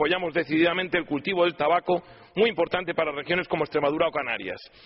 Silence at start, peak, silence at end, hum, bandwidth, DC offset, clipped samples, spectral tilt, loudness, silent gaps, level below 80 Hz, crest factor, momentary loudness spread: 0 s; -8 dBFS; 0.2 s; none; 5.8 kHz; under 0.1%; under 0.1%; -2.5 dB/octave; -25 LUFS; none; -60 dBFS; 16 dB; 6 LU